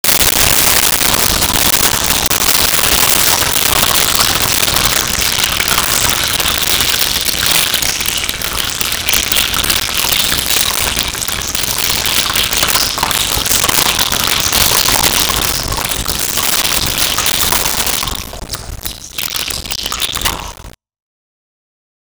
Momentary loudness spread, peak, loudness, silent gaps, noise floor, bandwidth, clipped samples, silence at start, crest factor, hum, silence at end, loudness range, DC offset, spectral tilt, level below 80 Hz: 8 LU; 0 dBFS; -11 LUFS; none; -34 dBFS; over 20 kHz; under 0.1%; 0.05 s; 14 dB; none; 1.45 s; 6 LU; under 0.1%; -0.5 dB/octave; -30 dBFS